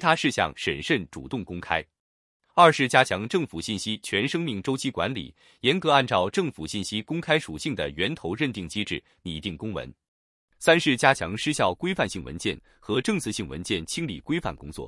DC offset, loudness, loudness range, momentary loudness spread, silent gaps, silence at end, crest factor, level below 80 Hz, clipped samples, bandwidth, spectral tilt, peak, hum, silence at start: under 0.1%; -25 LUFS; 5 LU; 13 LU; 2.00-2.40 s, 10.08-10.48 s; 0 s; 24 dB; -54 dBFS; under 0.1%; 12 kHz; -4.5 dB/octave; -2 dBFS; none; 0 s